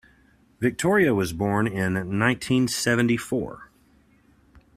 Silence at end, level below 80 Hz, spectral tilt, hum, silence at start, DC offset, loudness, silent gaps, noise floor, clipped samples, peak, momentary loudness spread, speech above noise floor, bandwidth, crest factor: 1.15 s; -54 dBFS; -5 dB/octave; none; 0.6 s; under 0.1%; -23 LUFS; none; -59 dBFS; under 0.1%; -4 dBFS; 7 LU; 36 dB; 15.5 kHz; 20 dB